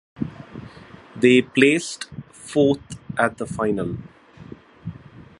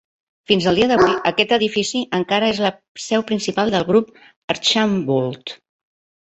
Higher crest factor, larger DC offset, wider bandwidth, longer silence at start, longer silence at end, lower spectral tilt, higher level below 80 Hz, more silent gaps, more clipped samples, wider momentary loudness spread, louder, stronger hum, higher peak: about the same, 22 dB vs 18 dB; neither; first, 11.5 kHz vs 8.4 kHz; second, 0.2 s vs 0.5 s; second, 0.2 s vs 0.65 s; about the same, -5 dB/octave vs -4.5 dB/octave; about the same, -52 dBFS vs -52 dBFS; second, none vs 2.88-2.95 s, 4.36-4.48 s; neither; first, 23 LU vs 11 LU; second, -21 LUFS vs -18 LUFS; neither; about the same, 0 dBFS vs 0 dBFS